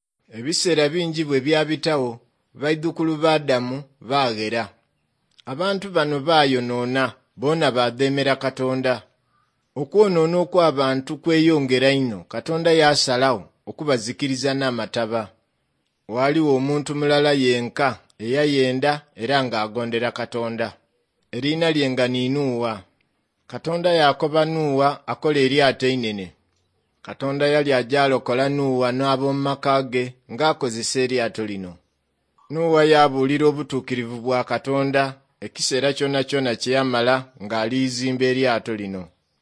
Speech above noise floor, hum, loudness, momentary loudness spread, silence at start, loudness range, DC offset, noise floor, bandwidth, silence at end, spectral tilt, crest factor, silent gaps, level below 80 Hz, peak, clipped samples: 51 dB; none; -21 LUFS; 11 LU; 0.35 s; 4 LU; under 0.1%; -71 dBFS; 10.5 kHz; 0.35 s; -5 dB/octave; 20 dB; none; -66 dBFS; -2 dBFS; under 0.1%